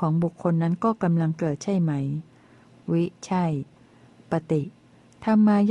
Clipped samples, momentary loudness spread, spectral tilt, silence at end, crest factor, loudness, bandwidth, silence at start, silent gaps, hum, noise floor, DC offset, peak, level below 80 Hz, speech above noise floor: under 0.1%; 11 LU; -8.5 dB/octave; 0 s; 14 dB; -25 LUFS; 9.2 kHz; 0 s; none; none; -53 dBFS; under 0.1%; -10 dBFS; -62 dBFS; 30 dB